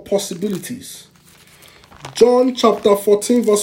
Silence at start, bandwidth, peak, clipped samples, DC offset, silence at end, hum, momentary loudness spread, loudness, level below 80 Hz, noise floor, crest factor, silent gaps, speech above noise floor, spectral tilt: 0.05 s; 17 kHz; 0 dBFS; under 0.1%; under 0.1%; 0 s; none; 20 LU; -16 LUFS; -58 dBFS; -47 dBFS; 16 dB; none; 32 dB; -4.5 dB/octave